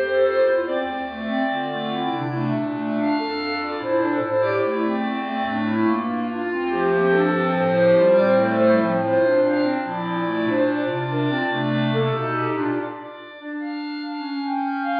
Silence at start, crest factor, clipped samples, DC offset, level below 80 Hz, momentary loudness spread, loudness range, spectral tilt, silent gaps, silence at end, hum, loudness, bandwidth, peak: 0 s; 14 dB; under 0.1%; under 0.1%; -62 dBFS; 10 LU; 6 LU; -9.5 dB/octave; none; 0 s; none; -22 LUFS; 5.2 kHz; -6 dBFS